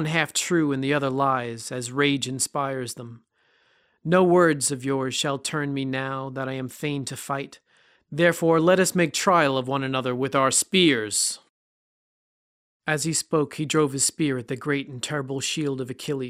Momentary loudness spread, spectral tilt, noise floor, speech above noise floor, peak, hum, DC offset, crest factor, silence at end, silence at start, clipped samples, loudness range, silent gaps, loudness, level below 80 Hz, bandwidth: 12 LU; -4 dB/octave; -64 dBFS; 41 dB; -4 dBFS; none; under 0.1%; 20 dB; 0 s; 0 s; under 0.1%; 5 LU; 11.49-12.80 s; -23 LUFS; -64 dBFS; 16 kHz